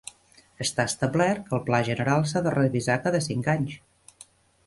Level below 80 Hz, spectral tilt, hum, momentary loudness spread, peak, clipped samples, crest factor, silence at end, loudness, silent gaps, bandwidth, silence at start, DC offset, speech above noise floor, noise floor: -58 dBFS; -5.5 dB/octave; none; 6 LU; -8 dBFS; under 0.1%; 20 dB; 0.9 s; -25 LUFS; none; 12 kHz; 0.6 s; under 0.1%; 33 dB; -57 dBFS